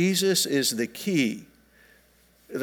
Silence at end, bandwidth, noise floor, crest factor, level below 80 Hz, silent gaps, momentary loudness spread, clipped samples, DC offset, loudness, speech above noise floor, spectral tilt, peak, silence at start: 0 s; 19.5 kHz; -60 dBFS; 16 dB; -68 dBFS; none; 12 LU; under 0.1%; under 0.1%; -24 LUFS; 36 dB; -3.5 dB/octave; -10 dBFS; 0 s